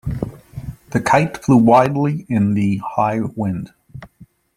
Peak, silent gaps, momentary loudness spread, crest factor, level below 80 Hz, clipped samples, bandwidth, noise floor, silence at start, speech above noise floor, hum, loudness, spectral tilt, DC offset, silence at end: -2 dBFS; none; 18 LU; 16 dB; -42 dBFS; under 0.1%; 15 kHz; -48 dBFS; 0.05 s; 32 dB; none; -17 LUFS; -7.5 dB/octave; under 0.1%; 0.5 s